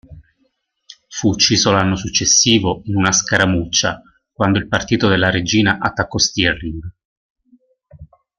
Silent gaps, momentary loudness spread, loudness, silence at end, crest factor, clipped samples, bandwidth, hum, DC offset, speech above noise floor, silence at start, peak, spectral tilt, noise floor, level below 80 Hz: 7.05-7.36 s; 10 LU; -15 LUFS; 0.35 s; 18 dB; under 0.1%; 11 kHz; none; under 0.1%; 49 dB; 0.1 s; 0 dBFS; -3 dB/octave; -65 dBFS; -42 dBFS